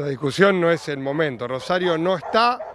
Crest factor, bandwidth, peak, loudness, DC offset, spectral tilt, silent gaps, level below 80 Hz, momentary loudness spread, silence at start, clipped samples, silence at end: 20 dB; 13 kHz; -2 dBFS; -21 LUFS; under 0.1%; -5.5 dB/octave; none; -60 dBFS; 8 LU; 0 s; under 0.1%; 0 s